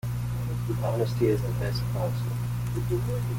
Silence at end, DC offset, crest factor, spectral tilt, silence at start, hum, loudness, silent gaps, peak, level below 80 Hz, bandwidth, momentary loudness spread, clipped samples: 0 s; under 0.1%; 14 dB; -7.5 dB/octave; 0.05 s; 60 Hz at -30 dBFS; -28 LUFS; none; -12 dBFS; -40 dBFS; 17 kHz; 5 LU; under 0.1%